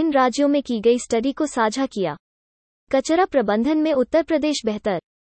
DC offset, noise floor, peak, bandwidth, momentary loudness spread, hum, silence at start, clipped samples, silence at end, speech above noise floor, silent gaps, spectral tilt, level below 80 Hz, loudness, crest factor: under 0.1%; under -90 dBFS; -6 dBFS; 8.8 kHz; 6 LU; none; 0 s; under 0.1%; 0.2 s; over 70 dB; 2.20-2.87 s; -4.5 dB/octave; -54 dBFS; -21 LUFS; 16 dB